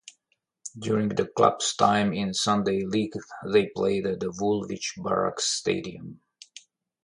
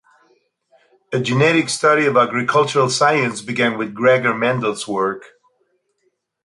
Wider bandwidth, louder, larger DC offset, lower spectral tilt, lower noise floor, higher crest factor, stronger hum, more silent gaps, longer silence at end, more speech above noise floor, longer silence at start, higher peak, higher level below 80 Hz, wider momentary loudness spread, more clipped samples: about the same, 11.5 kHz vs 11.5 kHz; second, -26 LUFS vs -17 LUFS; neither; about the same, -4 dB/octave vs -4.5 dB/octave; first, -75 dBFS vs -68 dBFS; about the same, 20 dB vs 16 dB; neither; neither; second, 0.85 s vs 1.25 s; about the same, 49 dB vs 51 dB; second, 0.05 s vs 1.1 s; second, -6 dBFS vs -2 dBFS; about the same, -60 dBFS vs -64 dBFS; first, 19 LU vs 7 LU; neither